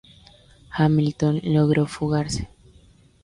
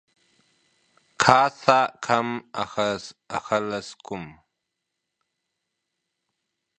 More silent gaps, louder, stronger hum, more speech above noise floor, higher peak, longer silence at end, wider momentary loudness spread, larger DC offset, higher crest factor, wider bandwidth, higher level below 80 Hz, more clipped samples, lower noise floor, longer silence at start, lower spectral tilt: neither; about the same, -22 LUFS vs -23 LUFS; neither; second, 33 dB vs 58 dB; second, -8 dBFS vs 0 dBFS; second, 0.75 s vs 2.45 s; second, 11 LU vs 18 LU; neither; second, 16 dB vs 26 dB; about the same, 11 kHz vs 10.5 kHz; first, -46 dBFS vs -64 dBFS; neither; second, -53 dBFS vs -82 dBFS; second, 0.7 s vs 1.2 s; first, -7 dB/octave vs -4 dB/octave